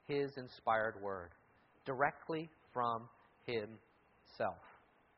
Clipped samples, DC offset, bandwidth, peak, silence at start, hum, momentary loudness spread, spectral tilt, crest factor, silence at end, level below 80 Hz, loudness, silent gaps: under 0.1%; under 0.1%; 5.8 kHz; -18 dBFS; 0.1 s; none; 16 LU; -3.5 dB/octave; 24 dB; 0.45 s; -76 dBFS; -41 LUFS; none